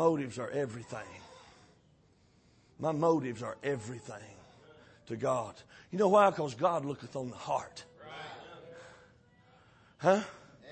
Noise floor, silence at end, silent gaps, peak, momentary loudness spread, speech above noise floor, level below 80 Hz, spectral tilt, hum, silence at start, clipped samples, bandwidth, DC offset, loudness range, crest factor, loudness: -66 dBFS; 0 s; none; -12 dBFS; 22 LU; 34 dB; -72 dBFS; -6 dB/octave; none; 0 s; under 0.1%; 8.8 kHz; under 0.1%; 6 LU; 22 dB; -32 LUFS